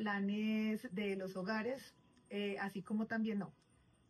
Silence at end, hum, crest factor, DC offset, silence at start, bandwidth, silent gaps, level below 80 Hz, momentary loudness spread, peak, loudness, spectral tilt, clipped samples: 0.6 s; none; 14 dB; under 0.1%; 0 s; 12.5 kHz; none; -80 dBFS; 9 LU; -26 dBFS; -40 LUFS; -6.5 dB/octave; under 0.1%